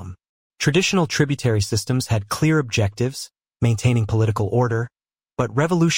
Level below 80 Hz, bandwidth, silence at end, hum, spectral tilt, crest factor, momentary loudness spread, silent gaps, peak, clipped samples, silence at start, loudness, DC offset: -48 dBFS; 16.5 kHz; 0 s; none; -5.5 dB/octave; 16 dB; 8 LU; 0.29-0.50 s; -4 dBFS; under 0.1%; 0 s; -21 LUFS; under 0.1%